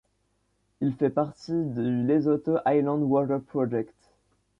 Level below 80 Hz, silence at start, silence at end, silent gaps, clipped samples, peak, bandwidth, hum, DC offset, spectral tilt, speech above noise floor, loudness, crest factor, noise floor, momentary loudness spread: -66 dBFS; 0.8 s; 0.75 s; none; under 0.1%; -12 dBFS; 7.4 kHz; 50 Hz at -65 dBFS; under 0.1%; -9.5 dB/octave; 47 dB; -26 LUFS; 16 dB; -72 dBFS; 7 LU